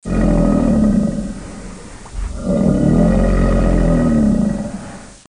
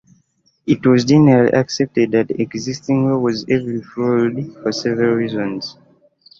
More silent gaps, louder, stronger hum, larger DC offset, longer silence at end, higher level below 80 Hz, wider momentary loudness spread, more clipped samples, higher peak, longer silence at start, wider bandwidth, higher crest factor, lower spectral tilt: neither; about the same, -15 LUFS vs -17 LUFS; neither; first, 0.7% vs under 0.1%; second, 0.15 s vs 0.65 s; first, -22 dBFS vs -54 dBFS; first, 19 LU vs 12 LU; neither; about the same, -2 dBFS vs -2 dBFS; second, 0.05 s vs 0.65 s; first, 10.5 kHz vs 7.6 kHz; about the same, 14 dB vs 16 dB; first, -8 dB/octave vs -6.5 dB/octave